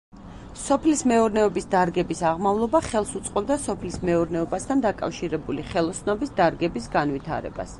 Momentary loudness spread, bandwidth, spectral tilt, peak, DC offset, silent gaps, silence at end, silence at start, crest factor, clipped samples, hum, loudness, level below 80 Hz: 9 LU; 11.5 kHz; -5.5 dB/octave; -6 dBFS; under 0.1%; none; 0 s; 0.15 s; 18 dB; under 0.1%; none; -24 LUFS; -44 dBFS